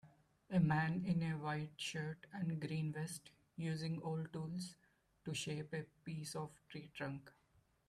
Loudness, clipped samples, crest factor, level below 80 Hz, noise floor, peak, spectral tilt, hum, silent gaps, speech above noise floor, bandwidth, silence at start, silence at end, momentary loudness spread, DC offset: -43 LUFS; under 0.1%; 18 dB; -74 dBFS; -76 dBFS; -24 dBFS; -5.5 dB/octave; none; none; 34 dB; 13 kHz; 0.05 s; 0.6 s; 14 LU; under 0.1%